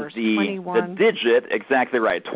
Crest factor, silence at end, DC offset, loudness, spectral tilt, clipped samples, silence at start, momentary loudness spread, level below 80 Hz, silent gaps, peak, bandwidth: 14 dB; 0 s; under 0.1%; -21 LUFS; -9 dB/octave; under 0.1%; 0 s; 4 LU; -68 dBFS; none; -6 dBFS; 4 kHz